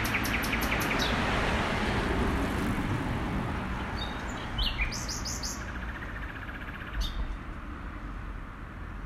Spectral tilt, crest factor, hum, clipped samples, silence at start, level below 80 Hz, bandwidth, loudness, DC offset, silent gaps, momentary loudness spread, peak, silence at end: -4.5 dB/octave; 16 dB; none; under 0.1%; 0 s; -38 dBFS; 15.5 kHz; -32 LUFS; under 0.1%; none; 13 LU; -16 dBFS; 0 s